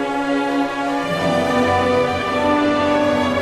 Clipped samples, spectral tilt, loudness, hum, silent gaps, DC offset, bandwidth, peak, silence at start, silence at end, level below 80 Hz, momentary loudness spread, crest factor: under 0.1%; -5.5 dB/octave; -18 LUFS; none; none; under 0.1%; 13.5 kHz; -4 dBFS; 0 s; 0 s; -46 dBFS; 4 LU; 12 dB